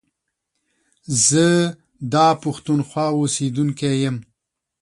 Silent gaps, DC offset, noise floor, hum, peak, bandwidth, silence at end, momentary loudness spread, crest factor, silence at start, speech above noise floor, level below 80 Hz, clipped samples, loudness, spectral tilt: none; under 0.1%; -78 dBFS; none; -2 dBFS; 11.5 kHz; 0.6 s; 9 LU; 18 dB; 1.1 s; 60 dB; -60 dBFS; under 0.1%; -19 LUFS; -4.5 dB/octave